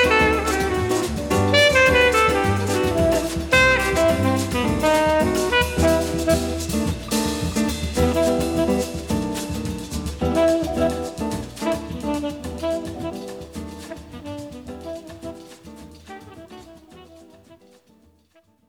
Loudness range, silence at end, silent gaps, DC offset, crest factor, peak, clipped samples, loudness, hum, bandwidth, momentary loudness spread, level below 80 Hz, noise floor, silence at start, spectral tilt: 19 LU; 1.15 s; none; under 0.1%; 16 dB; -6 dBFS; under 0.1%; -20 LUFS; none; over 20 kHz; 20 LU; -36 dBFS; -59 dBFS; 0 s; -4.5 dB/octave